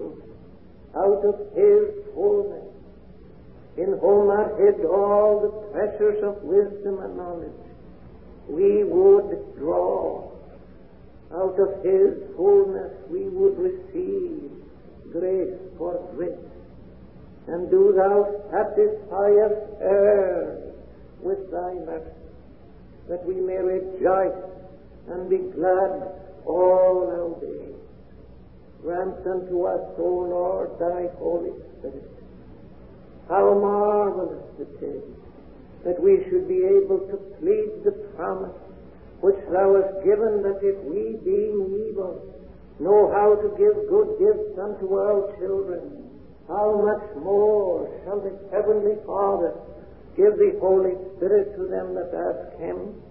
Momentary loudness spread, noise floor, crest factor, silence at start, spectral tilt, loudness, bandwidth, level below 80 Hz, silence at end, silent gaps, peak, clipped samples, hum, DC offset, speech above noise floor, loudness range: 16 LU; -48 dBFS; 16 dB; 0 s; -12 dB/octave; -22 LUFS; 2.9 kHz; -52 dBFS; 0.1 s; none; -6 dBFS; under 0.1%; none; 0.3%; 26 dB; 6 LU